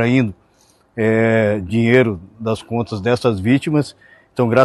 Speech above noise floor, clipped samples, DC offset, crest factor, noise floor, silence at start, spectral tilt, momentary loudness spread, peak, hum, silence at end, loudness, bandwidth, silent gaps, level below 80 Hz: 39 dB; under 0.1%; under 0.1%; 16 dB; -55 dBFS; 0 s; -7.5 dB/octave; 10 LU; 0 dBFS; none; 0 s; -17 LUFS; 12 kHz; none; -50 dBFS